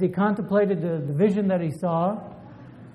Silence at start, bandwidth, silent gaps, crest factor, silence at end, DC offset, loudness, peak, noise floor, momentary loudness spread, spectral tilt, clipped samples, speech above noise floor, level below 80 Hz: 0 s; 10.5 kHz; none; 16 dB; 0 s; under 0.1%; -24 LUFS; -8 dBFS; -44 dBFS; 21 LU; -9.5 dB/octave; under 0.1%; 20 dB; -62 dBFS